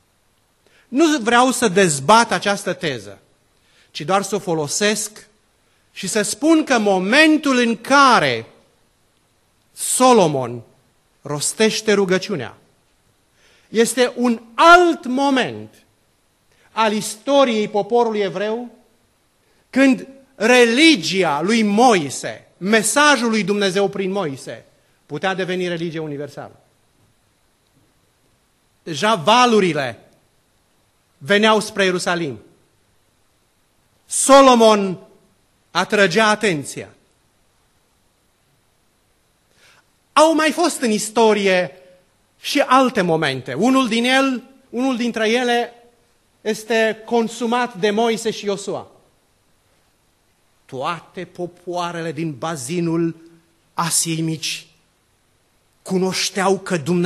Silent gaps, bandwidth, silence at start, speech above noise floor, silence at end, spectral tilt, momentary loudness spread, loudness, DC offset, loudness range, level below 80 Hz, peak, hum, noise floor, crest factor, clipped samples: none; 13 kHz; 0.9 s; 44 dB; 0 s; -3.5 dB/octave; 16 LU; -17 LUFS; under 0.1%; 10 LU; -62 dBFS; 0 dBFS; none; -61 dBFS; 20 dB; under 0.1%